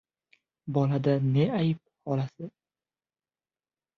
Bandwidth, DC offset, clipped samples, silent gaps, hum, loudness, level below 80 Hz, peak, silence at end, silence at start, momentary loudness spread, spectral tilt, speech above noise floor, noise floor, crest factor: 6.2 kHz; under 0.1%; under 0.1%; none; none; -28 LUFS; -68 dBFS; -14 dBFS; 1.5 s; 0.65 s; 18 LU; -9.5 dB/octave; over 64 dB; under -90 dBFS; 16 dB